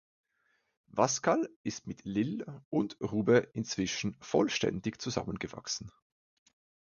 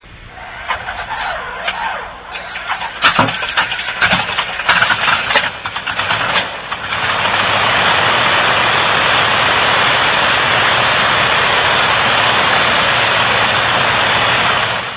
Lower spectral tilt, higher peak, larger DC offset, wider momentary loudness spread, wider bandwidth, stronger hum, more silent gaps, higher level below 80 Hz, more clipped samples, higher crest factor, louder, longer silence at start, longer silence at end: second, -4.5 dB/octave vs -6.5 dB/octave; second, -10 dBFS vs 0 dBFS; neither; about the same, 12 LU vs 10 LU; first, 7.4 kHz vs 4 kHz; neither; first, 1.56-1.64 s, 2.65-2.71 s vs none; second, -62 dBFS vs -40 dBFS; neither; first, 22 dB vs 14 dB; second, -33 LUFS vs -12 LUFS; first, 0.95 s vs 0.05 s; first, 0.95 s vs 0 s